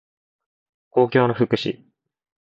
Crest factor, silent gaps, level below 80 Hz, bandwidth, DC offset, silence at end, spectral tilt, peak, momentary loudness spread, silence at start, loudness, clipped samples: 22 dB; none; -64 dBFS; 7.4 kHz; under 0.1%; 0.85 s; -7.5 dB/octave; -2 dBFS; 11 LU; 0.95 s; -21 LUFS; under 0.1%